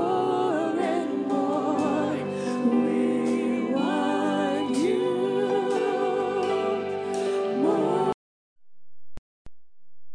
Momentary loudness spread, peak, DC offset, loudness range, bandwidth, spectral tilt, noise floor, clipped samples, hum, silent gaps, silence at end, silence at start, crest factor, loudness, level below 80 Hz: 4 LU; -10 dBFS; under 0.1%; 3 LU; 10.5 kHz; -6 dB/octave; -46 dBFS; under 0.1%; none; 8.14-8.56 s, 9.18-9.45 s; 0 s; 0 s; 14 dB; -25 LUFS; -62 dBFS